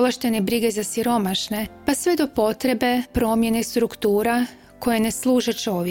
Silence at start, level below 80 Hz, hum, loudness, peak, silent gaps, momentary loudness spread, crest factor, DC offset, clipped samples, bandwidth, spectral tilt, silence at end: 0 s; -46 dBFS; none; -22 LUFS; -6 dBFS; none; 4 LU; 14 dB; 0.1%; under 0.1%; 17 kHz; -4 dB/octave; 0 s